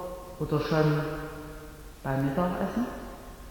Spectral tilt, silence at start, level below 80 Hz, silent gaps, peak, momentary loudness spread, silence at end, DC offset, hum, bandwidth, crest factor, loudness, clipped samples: -7.5 dB/octave; 0 s; -46 dBFS; none; -12 dBFS; 18 LU; 0 s; under 0.1%; none; 19 kHz; 18 dB; -30 LUFS; under 0.1%